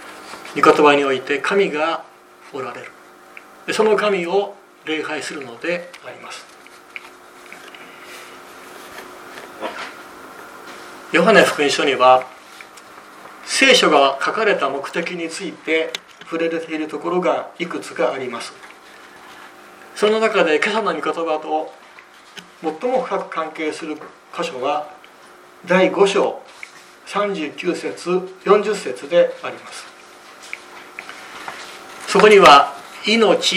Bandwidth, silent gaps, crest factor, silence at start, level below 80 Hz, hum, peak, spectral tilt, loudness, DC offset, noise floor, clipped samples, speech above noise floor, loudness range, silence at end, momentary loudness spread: 16 kHz; none; 20 dB; 0 s; -62 dBFS; none; 0 dBFS; -3.5 dB/octave; -17 LUFS; under 0.1%; -44 dBFS; under 0.1%; 27 dB; 14 LU; 0 s; 25 LU